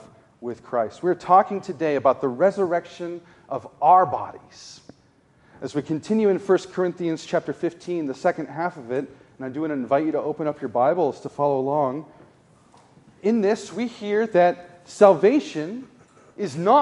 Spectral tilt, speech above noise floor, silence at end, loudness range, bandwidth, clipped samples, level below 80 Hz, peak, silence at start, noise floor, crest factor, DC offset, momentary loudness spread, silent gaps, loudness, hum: -6.5 dB/octave; 36 dB; 0 s; 5 LU; 11 kHz; under 0.1%; -68 dBFS; -2 dBFS; 0.4 s; -58 dBFS; 22 dB; under 0.1%; 17 LU; none; -22 LUFS; none